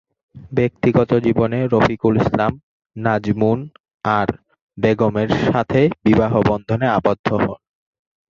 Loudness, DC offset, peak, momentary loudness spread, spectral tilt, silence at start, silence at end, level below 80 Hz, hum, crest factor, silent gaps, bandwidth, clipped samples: -18 LUFS; under 0.1%; -2 dBFS; 9 LU; -8.5 dB/octave; 0.35 s; 0.75 s; -42 dBFS; none; 16 dB; 2.63-2.80 s, 2.86-2.90 s, 3.80-3.84 s, 3.94-4.00 s, 4.62-4.69 s, 7.19-7.24 s; 7.2 kHz; under 0.1%